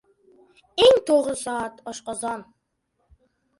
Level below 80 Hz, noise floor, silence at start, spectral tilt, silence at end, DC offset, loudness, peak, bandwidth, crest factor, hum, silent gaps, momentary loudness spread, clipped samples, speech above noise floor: -60 dBFS; -74 dBFS; 0.75 s; -2.5 dB/octave; 1.15 s; under 0.1%; -22 LUFS; -4 dBFS; 11.5 kHz; 20 dB; none; none; 17 LU; under 0.1%; 48 dB